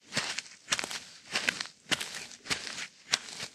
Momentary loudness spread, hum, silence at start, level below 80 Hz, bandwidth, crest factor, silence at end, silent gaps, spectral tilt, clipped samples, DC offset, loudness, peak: 8 LU; none; 0.05 s; -70 dBFS; 15.5 kHz; 32 dB; 0 s; none; -0.5 dB/octave; under 0.1%; under 0.1%; -33 LUFS; -4 dBFS